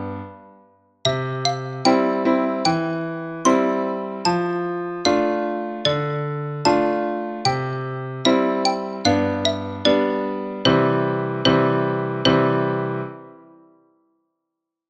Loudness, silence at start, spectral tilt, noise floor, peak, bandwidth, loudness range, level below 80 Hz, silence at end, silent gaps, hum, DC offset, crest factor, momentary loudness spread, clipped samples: -21 LUFS; 0 s; -5 dB/octave; -82 dBFS; -2 dBFS; 10 kHz; 2 LU; -56 dBFS; 1.55 s; none; none; under 0.1%; 18 dB; 9 LU; under 0.1%